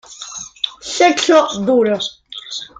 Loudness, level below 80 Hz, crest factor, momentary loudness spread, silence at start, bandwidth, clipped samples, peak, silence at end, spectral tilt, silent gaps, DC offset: -15 LUFS; -58 dBFS; 16 dB; 16 LU; 0.1 s; 9.6 kHz; under 0.1%; -2 dBFS; 0.15 s; -3 dB/octave; none; under 0.1%